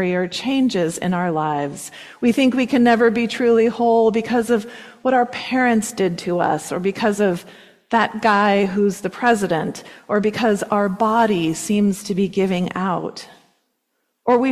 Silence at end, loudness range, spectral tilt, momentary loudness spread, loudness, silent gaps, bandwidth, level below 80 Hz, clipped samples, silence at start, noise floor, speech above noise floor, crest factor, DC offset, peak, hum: 0 s; 3 LU; -5.5 dB/octave; 7 LU; -19 LUFS; none; 14 kHz; -58 dBFS; under 0.1%; 0 s; -72 dBFS; 53 dB; 14 dB; under 0.1%; -4 dBFS; none